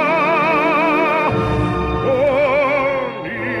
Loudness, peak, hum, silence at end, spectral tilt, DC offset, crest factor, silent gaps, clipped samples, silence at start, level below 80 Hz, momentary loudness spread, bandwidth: -16 LUFS; -4 dBFS; none; 0 s; -7 dB/octave; under 0.1%; 12 dB; none; under 0.1%; 0 s; -34 dBFS; 7 LU; 12.5 kHz